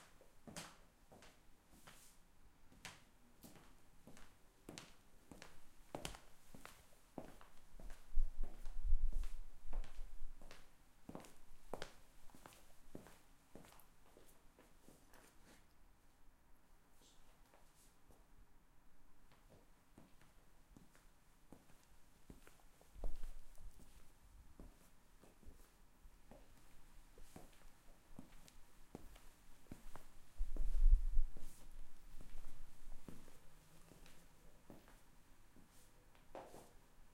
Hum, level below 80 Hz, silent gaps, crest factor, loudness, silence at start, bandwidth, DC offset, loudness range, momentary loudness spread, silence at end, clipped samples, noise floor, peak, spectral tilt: none; -46 dBFS; none; 24 dB; -53 LUFS; 0.35 s; 12.5 kHz; under 0.1%; 20 LU; 19 LU; 0.05 s; under 0.1%; -66 dBFS; -20 dBFS; -5 dB/octave